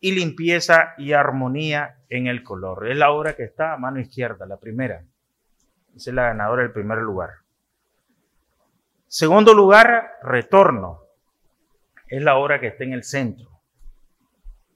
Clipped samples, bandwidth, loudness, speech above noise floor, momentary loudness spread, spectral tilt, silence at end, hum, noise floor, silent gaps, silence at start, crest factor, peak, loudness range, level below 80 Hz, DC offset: under 0.1%; 14 kHz; -18 LUFS; 55 dB; 18 LU; -5 dB/octave; 0.25 s; none; -73 dBFS; none; 0.05 s; 20 dB; 0 dBFS; 11 LU; -50 dBFS; under 0.1%